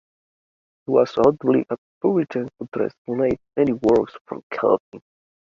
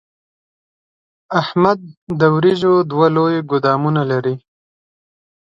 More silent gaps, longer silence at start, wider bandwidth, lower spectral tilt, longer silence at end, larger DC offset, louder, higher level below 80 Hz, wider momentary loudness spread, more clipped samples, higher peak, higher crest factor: first, 1.78-2.01 s, 2.68-2.72 s, 2.98-3.05 s, 4.21-4.25 s, 4.43-4.50 s, 4.80-4.92 s vs 1.97-2.07 s; second, 0.9 s vs 1.3 s; about the same, 7.2 kHz vs 7.6 kHz; about the same, -8 dB/octave vs -8 dB/octave; second, 0.45 s vs 1.05 s; neither; second, -21 LUFS vs -16 LUFS; about the same, -56 dBFS vs -58 dBFS; first, 13 LU vs 9 LU; neither; about the same, -2 dBFS vs 0 dBFS; about the same, 20 dB vs 18 dB